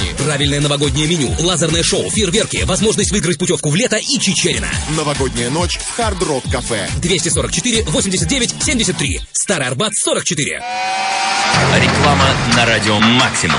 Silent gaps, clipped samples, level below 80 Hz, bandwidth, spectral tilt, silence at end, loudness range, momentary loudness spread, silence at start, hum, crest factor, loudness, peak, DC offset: none; under 0.1%; -30 dBFS; 11.5 kHz; -3.5 dB/octave; 0 s; 3 LU; 7 LU; 0 s; none; 16 dB; -14 LUFS; 0 dBFS; under 0.1%